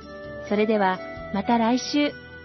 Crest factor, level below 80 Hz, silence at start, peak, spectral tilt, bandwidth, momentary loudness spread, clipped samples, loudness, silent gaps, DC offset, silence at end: 16 dB; -54 dBFS; 0 s; -8 dBFS; -5 dB/octave; 6.2 kHz; 10 LU; under 0.1%; -24 LUFS; none; under 0.1%; 0 s